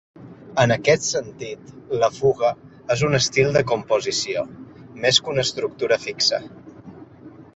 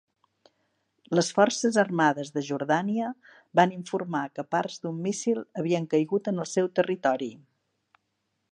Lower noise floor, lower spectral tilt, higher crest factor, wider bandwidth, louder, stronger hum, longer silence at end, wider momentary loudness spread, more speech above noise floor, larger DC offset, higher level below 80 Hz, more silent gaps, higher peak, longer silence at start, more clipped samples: second, -44 dBFS vs -78 dBFS; second, -3.5 dB/octave vs -5 dB/octave; about the same, 20 dB vs 22 dB; second, 8.2 kHz vs 11 kHz; first, -21 LUFS vs -27 LUFS; neither; second, 0.1 s vs 1.15 s; first, 16 LU vs 9 LU; second, 23 dB vs 52 dB; neither; first, -54 dBFS vs -78 dBFS; neither; first, -2 dBFS vs -6 dBFS; second, 0.2 s vs 1.1 s; neither